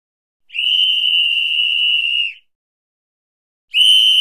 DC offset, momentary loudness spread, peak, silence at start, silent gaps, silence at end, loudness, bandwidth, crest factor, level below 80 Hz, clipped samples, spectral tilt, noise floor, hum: 0.2%; 10 LU; -4 dBFS; 0.55 s; 2.55-3.68 s; 0 s; -12 LUFS; 16 kHz; 12 dB; -76 dBFS; under 0.1%; 6.5 dB/octave; under -90 dBFS; none